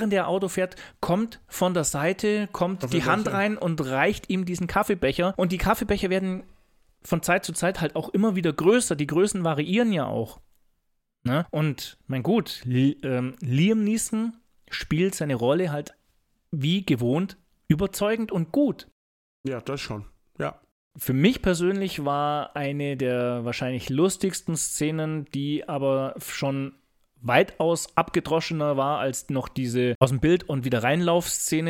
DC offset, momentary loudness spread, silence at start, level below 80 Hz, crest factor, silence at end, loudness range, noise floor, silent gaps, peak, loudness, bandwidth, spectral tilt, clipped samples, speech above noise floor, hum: under 0.1%; 10 LU; 0 s; -48 dBFS; 22 dB; 0 s; 3 LU; -73 dBFS; 18.92-19.44 s, 20.71-20.91 s, 29.95-30.01 s; -2 dBFS; -25 LUFS; 17 kHz; -5.5 dB/octave; under 0.1%; 48 dB; none